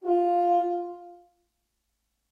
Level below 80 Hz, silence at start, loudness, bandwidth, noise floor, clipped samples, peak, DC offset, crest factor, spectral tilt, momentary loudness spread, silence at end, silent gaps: -78 dBFS; 0 s; -25 LUFS; 4.8 kHz; -78 dBFS; under 0.1%; -14 dBFS; under 0.1%; 14 dB; -6 dB/octave; 17 LU; 1.15 s; none